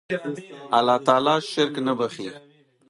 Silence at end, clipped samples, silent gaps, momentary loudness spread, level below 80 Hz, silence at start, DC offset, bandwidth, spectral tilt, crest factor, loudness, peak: 0.5 s; under 0.1%; none; 16 LU; -72 dBFS; 0.1 s; under 0.1%; 11.5 kHz; -5 dB/octave; 20 dB; -22 LUFS; -2 dBFS